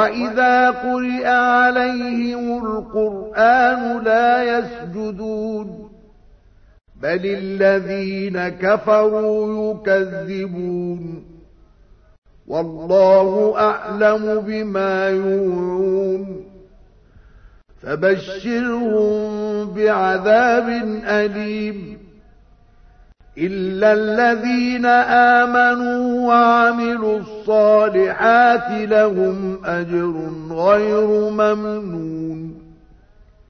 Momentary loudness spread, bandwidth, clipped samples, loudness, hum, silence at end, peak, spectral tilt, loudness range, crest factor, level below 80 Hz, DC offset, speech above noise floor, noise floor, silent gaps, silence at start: 13 LU; 6.6 kHz; under 0.1%; -17 LUFS; none; 0.75 s; -2 dBFS; -6.5 dB/octave; 8 LU; 16 dB; -50 dBFS; under 0.1%; 32 dB; -49 dBFS; 12.18-12.22 s; 0 s